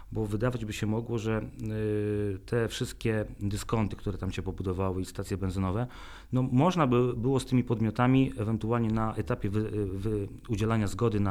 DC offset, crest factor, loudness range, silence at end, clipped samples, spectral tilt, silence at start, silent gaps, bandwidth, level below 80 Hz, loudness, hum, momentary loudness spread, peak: under 0.1%; 18 dB; 5 LU; 0 s; under 0.1%; -7 dB/octave; 0 s; none; 14.5 kHz; -46 dBFS; -30 LUFS; none; 9 LU; -12 dBFS